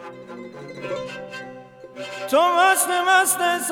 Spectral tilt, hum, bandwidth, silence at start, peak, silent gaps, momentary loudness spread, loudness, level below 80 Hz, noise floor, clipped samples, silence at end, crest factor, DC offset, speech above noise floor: -1 dB/octave; none; 19.5 kHz; 0 s; -4 dBFS; none; 21 LU; -19 LUFS; -68 dBFS; -41 dBFS; under 0.1%; 0 s; 18 dB; under 0.1%; 23 dB